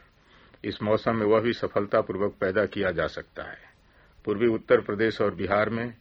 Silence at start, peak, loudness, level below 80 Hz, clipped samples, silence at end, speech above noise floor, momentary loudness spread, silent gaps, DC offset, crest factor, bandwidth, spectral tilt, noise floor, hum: 0.65 s; -6 dBFS; -26 LUFS; -56 dBFS; under 0.1%; 0.05 s; 31 dB; 14 LU; none; under 0.1%; 20 dB; 7.2 kHz; -8 dB/octave; -57 dBFS; none